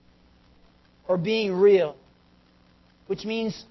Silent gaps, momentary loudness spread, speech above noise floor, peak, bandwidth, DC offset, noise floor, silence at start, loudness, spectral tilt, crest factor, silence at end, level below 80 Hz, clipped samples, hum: none; 14 LU; 36 dB; -10 dBFS; 6 kHz; under 0.1%; -59 dBFS; 1.1 s; -24 LUFS; -6.5 dB/octave; 18 dB; 0.1 s; -62 dBFS; under 0.1%; none